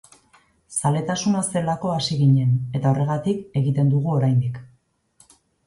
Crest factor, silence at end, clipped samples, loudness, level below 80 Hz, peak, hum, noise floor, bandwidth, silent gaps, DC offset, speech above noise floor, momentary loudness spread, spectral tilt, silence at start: 14 dB; 1 s; under 0.1%; -21 LUFS; -56 dBFS; -8 dBFS; none; -62 dBFS; 11.5 kHz; none; under 0.1%; 42 dB; 6 LU; -6 dB/octave; 0.7 s